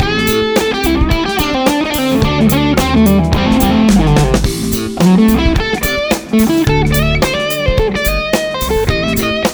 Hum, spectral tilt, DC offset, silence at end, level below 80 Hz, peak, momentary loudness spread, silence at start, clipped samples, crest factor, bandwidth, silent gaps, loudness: none; -5.5 dB/octave; under 0.1%; 0 s; -20 dBFS; 0 dBFS; 5 LU; 0 s; under 0.1%; 12 dB; over 20 kHz; none; -12 LUFS